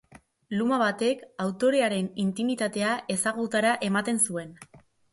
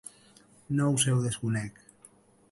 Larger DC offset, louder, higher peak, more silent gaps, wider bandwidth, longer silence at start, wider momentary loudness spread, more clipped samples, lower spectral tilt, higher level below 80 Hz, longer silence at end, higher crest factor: neither; about the same, -26 LUFS vs -28 LUFS; about the same, -12 dBFS vs -12 dBFS; neither; about the same, 12 kHz vs 11.5 kHz; second, 0.15 s vs 0.7 s; second, 7 LU vs 15 LU; neither; about the same, -4 dB/octave vs -4.5 dB/octave; second, -70 dBFS vs -62 dBFS; second, 0.35 s vs 0.8 s; about the same, 16 dB vs 20 dB